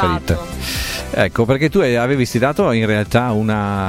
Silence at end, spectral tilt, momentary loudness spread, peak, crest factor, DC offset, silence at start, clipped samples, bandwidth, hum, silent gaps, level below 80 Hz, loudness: 0 s; -6 dB/octave; 7 LU; 0 dBFS; 16 dB; under 0.1%; 0 s; under 0.1%; 16.5 kHz; none; none; -34 dBFS; -17 LUFS